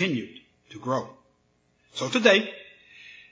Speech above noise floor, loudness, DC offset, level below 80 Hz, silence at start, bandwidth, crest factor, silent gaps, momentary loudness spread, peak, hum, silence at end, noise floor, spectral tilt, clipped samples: 43 dB; -24 LUFS; under 0.1%; -74 dBFS; 0 s; 8 kHz; 24 dB; none; 26 LU; -4 dBFS; none; 0.2 s; -68 dBFS; -4 dB/octave; under 0.1%